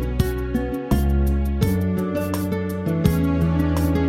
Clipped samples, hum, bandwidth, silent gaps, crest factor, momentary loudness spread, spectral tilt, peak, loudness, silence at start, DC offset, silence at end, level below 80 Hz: under 0.1%; none; 16.5 kHz; none; 18 dB; 5 LU; -7.5 dB/octave; -2 dBFS; -22 LUFS; 0 s; under 0.1%; 0 s; -26 dBFS